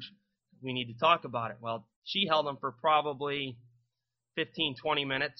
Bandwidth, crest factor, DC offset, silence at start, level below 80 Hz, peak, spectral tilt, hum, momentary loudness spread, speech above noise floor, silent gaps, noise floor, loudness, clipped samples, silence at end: 6.2 kHz; 22 dB; under 0.1%; 0 s; -72 dBFS; -10 dBFS; -1.5 dB/octave; none; 13 LU; 55 dB; 1.96-2.02 s; -87 dBFS; -31 LUFS; under 0.1%; 0.1 s